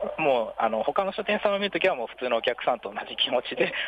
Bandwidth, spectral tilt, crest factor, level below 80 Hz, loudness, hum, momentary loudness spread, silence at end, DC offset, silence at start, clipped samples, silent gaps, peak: 9 kHz; -5.5 dB/octave; 16 dB; -64 dBFS; -26 LUFS; none; 4 LU; 0 s; under 0.1%; 0 s; under 0.1%; none; -10 dBFS